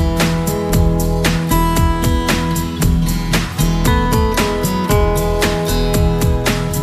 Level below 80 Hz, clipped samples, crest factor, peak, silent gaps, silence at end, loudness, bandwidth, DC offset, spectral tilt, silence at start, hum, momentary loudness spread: -20 dBFS; under 0.1%; 14 dB; -2 dBFS; none; 0 s; -16 LUFS; 15.5 kHz; under 0.1%; -5.5 dB/octave; 0 s; none; 3 LU